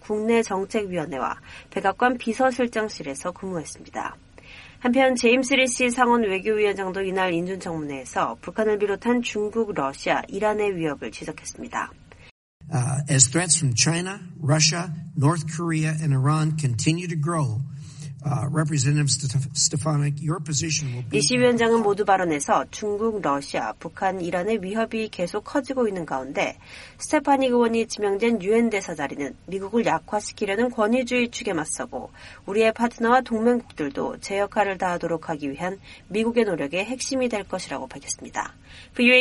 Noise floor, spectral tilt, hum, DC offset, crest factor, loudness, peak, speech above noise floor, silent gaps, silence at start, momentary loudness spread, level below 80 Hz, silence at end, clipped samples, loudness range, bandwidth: -45 dBFS; -4.5 dB/octave; none; under 0.1%; 24 dB; -23 LUFS; 0 dBFS; 22 dB; 12.31-12.60 s; 0.05 s; 12 LU; -54 dBFS; 0 s; under 0.1%; 5 LU; 11.5 kHz